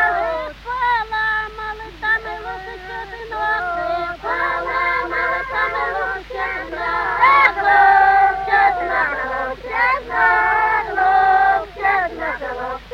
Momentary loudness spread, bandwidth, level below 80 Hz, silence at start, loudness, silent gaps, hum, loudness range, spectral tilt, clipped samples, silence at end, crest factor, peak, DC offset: 14 LU; 7.6 kHz; -42 dBFS; 0 s; -17 LUFS; none; none; 7 LU; -4.5 dB/octave; under 0.1%; 0 s; 18 dB; 0 dBFS; under 0.1%